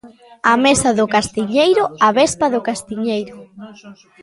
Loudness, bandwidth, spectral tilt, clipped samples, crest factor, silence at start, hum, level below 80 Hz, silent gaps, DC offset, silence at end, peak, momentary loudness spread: -16 LUFS; 11.5 kHz; -3.5 dB/octave; under 0.1%; 16 dB; 0.05 s; none; -50 dBFS; none; under 0.1%; 0.3 s; 0 dBFS; 10 LU